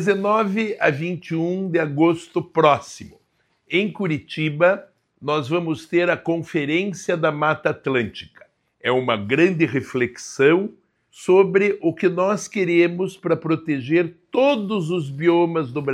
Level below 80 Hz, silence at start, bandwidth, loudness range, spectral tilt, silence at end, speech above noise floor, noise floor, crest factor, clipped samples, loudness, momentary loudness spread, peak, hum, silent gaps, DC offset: -66 dBFS; 0 s; 11.5 kHz; 3 LU; -6 dB/octave; 0 s; 46 dB; -66 dBFS; 20 dB; under 0.1%; -20 LUFS; 8 LU; -2 dBFS; none; none; under 0.1%